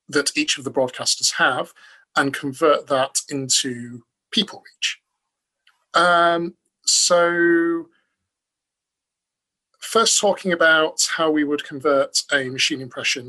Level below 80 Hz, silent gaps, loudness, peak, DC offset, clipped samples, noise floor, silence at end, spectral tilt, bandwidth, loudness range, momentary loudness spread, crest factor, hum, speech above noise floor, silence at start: -68 dBFS; none; -19 LUFS; -4 dBFS; under 0.1%; under 0.1%; -84 dBFS; 0 s; -2 dB/octave; 13 kHz; 3 LU; 10 LU; 18 dB; none; 64 dB; 0.1 s